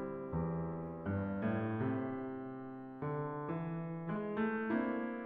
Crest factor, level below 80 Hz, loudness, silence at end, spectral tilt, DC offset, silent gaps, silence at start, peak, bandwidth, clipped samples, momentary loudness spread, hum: 16 dB; -62 dBFS; -39 LUFS; 0 s; -8 dB/octave; under 0.1%; none; 0 s; -22 dBFS; 4.2 kHz; under 0.1%; 8 LU; none